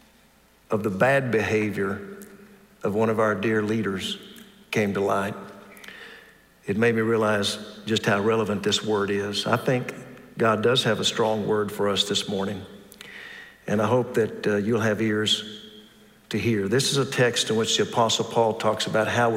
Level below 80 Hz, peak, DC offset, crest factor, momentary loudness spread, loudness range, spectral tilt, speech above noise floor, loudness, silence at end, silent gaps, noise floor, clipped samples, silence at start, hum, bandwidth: -66 dBFS; -6 dBFS; under 0.1%; 18 dB; 18 LU; 3 LU; -4.5 dB/octave; 34 dB; -24 LUFS; 0 s; none; -58 dBFS; under 0.1%; 0.7 s; none; 16 kHz